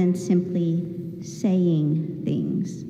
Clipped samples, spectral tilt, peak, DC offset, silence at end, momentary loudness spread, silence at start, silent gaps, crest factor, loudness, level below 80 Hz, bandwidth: under 0.1%; -8.5 dB/octave; -10 dBFS; under 0.1%; 0 s; 10 LU; 0 s; none; 12 dB; -24 LUFS; -64 dBFS; 9.4 kHz